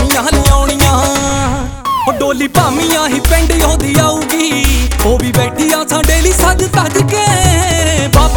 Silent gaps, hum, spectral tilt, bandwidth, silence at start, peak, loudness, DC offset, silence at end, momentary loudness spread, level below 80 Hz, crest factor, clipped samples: none; none; -4 dB/octave; over 20 kHz; 0 s; 0 dBFS; -11 LUFS; under 0.1%; 0 s; 4 LU; -16 dBFS; 10 dB; 0.3%